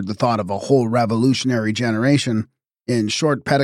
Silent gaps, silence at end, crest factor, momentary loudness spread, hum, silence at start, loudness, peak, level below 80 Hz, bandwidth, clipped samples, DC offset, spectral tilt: none; 0 s; 16 dB; 6 LU; none; 0 s; -19 LUFS; -4 dBFS; -58 dBFS; 12.5 kHz; under 0.1%; under 0.1%; -5.5 dB/octave